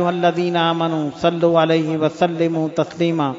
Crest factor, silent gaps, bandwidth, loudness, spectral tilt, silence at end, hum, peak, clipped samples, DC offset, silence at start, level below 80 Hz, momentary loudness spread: 16 dB; none; 7.8 kHz; -18 LUFS; -7 dB/octave; 0 s; none; -2 dBFS; under 0.1%; under 0.1%; 0 s; -60 dBFS; 5 LU